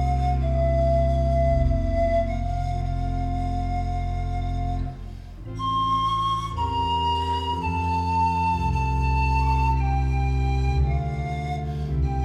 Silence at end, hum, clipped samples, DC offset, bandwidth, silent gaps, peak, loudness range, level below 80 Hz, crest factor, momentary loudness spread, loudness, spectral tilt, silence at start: 0 s; none; under 0.1%; under 0.1%; 8.6 kHz; none; -10 dBFS; 4 LU; -26 dBFS; 14 dB; 7 LU; -24 LUFS; -7.5 dB/octave; 0 s